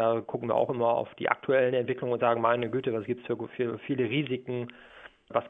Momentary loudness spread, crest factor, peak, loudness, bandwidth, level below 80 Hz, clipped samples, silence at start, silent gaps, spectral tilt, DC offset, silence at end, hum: 8 LU; 24 dB; -6 dBFS; -29 LUFS; 3.9 kHz; -70 dBFS; under 0.1%; 0 s; none; -9 dB/octave; under 0.1%; 0 s; none